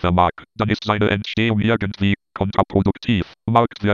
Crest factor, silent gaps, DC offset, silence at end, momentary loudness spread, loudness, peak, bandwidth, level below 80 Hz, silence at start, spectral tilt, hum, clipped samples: 18 dB; none; under 0.1%; 0 s; 4 LU; -20 LUFS; 0 dBFS; 7.2 kHz; -36 dBFS; 0 s; -7.5 dB/octave; none; under 0.1%